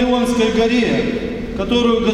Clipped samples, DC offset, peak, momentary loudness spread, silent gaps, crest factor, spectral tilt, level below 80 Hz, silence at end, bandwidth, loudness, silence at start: under 0.1%; under 0.1%; -2 dBFS; 9 LU; none; 14 dB; -5 dB/octave; -34 dBFS; 0 s; 12.5 kHz; -17 LUFS; 0 s